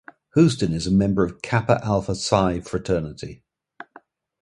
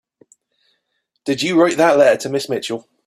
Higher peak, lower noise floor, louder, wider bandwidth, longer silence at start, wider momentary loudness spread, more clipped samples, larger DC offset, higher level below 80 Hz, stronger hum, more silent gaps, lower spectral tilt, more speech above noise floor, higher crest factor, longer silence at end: about the same, -2 dBFS vs 0 dBFS; second, -52 dBFS vs -71 dBFS; second, -22 LUFS vs -16 LUFS; second, 11.5 kHz vs 14.5 kHz; second, 0.35 s vs 1.25 s; second, 9 LU vs 12 LU; neither; neither; first, -44 dBFS vs -64 dBFS; neither; neither; first, -6 dB/octave vs -4.5 dB/octave; second, 31 dB vs 56 dB; about the same, 22 dB vs 18 dB; first, 1.05 s vs 0.25 s